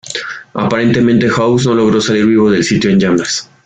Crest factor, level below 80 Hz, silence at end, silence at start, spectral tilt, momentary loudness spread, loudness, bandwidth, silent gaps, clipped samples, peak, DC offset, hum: 12 dB; -44 dBFS; 0.2 s; 0.05 s; -5.5 dB/octave; 8 LU; -12 LUFS; 9.4 kHz; none; under 0.1%; 0 dBFS; under 0.1%; none